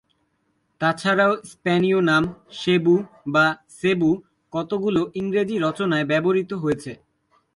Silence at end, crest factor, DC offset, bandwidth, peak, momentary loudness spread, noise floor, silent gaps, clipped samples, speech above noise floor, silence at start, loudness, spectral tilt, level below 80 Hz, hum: 0.6 s; 16 dB; under 0.1%; 11.5 kHz; -6 dBFS; 9 LU; -69 dBFS; none; under 0.1%; 48 dB; 0.8 s; -22 LUFS; -6.5 dB/octave; -58 dBFS; none